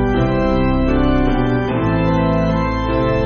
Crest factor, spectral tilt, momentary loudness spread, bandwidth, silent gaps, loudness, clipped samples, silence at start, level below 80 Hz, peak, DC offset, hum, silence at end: 12 dB; -6.5 dB/octave; 2 LU; 6.6 kHz; none; -17 LUFS; under 0.1%; 0 s; -24 dBFS; -4 dBFS; under 0.1%; none; 0 s